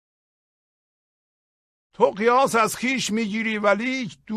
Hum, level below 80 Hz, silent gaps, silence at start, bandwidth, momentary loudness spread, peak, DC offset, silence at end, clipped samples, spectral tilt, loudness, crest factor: none; -64 dBFS; none; 2 s; 15 kHz; 6 LU; -4 dBFS; under 0.1%; 0 s; under 0.1%; -4 dB/octave; -21 LUFS; 20 dB